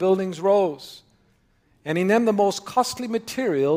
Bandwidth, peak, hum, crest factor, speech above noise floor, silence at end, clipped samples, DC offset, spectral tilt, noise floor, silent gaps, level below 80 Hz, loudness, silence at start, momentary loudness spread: 16 kHz; -6 dBFS; none; 16 dB; 41 dB; 0 s; under 0.1%; under 0.1%; -5 dB/octave; -62 dBFS; none; -64 dBFS; -22 LUFS; 0 s; 11 LU